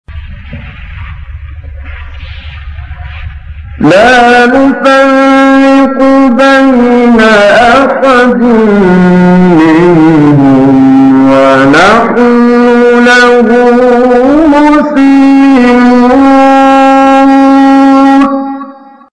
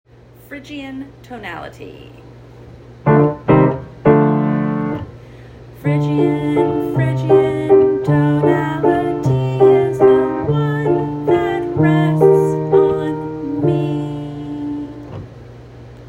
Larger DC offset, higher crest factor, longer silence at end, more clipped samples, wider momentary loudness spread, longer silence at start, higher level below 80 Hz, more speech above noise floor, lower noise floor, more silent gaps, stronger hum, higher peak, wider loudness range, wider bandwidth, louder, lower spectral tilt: neither; second, 4 dB vs 16 dB; first, 0.4 s vs 0 s; first, 2% vs under 0.1%; first, 21 LU vs 18 LU; second, 0.1 s vs 0.5 s; first, -28 dBFS vs -46 dBFS; first, 24 dB vs 19 dB; second, -27 dBFS vs -38 dBFS; neither; neither; about the same, 0 dBFS vs 0 dBFS; about the same, 5 LU vs 5 LU; about the same, 10 kHz vs 11 kHz; first, -4 LUFS vs -15 LUFS; second, -6.5 dB/octave vs -9 dB/octave